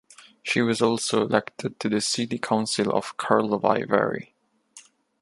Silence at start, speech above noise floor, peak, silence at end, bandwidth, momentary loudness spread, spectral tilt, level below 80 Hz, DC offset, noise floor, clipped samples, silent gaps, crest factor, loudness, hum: 0.2 s; 29 dB; -4 dBFS; 0.4 s; 11.5 kHz; 6 LU; -4 dB/octave; -68 dBFS; under 0.1%; -53 dBFS; under 0.1%; none; 22 dB; -24 LUFS; none